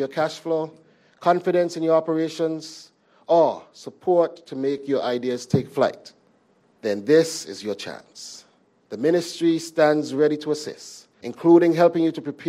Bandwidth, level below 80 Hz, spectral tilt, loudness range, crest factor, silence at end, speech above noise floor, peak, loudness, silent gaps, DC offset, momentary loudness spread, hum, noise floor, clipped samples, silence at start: 13.5 kHz; -68 dBFS; -5.5 dB/octave; 4 LU; 18 dB; 0 s; 39 dB; -4 dBFS; -22 LUFS; none; under 0.1%; 19 LU; none; -61 dBFS; under 0.1%; 0 s